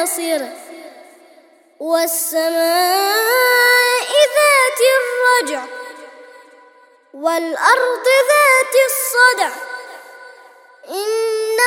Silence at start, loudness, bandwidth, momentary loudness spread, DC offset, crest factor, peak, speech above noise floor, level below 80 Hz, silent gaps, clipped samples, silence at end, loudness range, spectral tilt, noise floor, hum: 0 s; -14 LUFS; 19 kHz; 18 LU; under 0.1%; 16 dB; 0 dBFS; 34 dB; -78 dBFS; none; under 0.1%; 0 s; 5 LU; 1.5 dB/octave; -49 dBFS; none